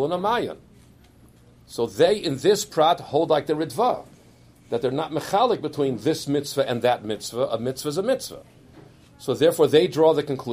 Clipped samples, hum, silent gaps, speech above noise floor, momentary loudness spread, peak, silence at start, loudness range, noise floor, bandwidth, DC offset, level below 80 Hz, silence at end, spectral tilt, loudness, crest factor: under 0.1%; none; none; 30 dB; 10 LU; -4 dBFS; 0 s; 3 LU; -52 dBFS; 15.5 kHz; under 0.1%; -58 dBFS; 0 s; -5 dB/octave; -23 LUFS; 20 dB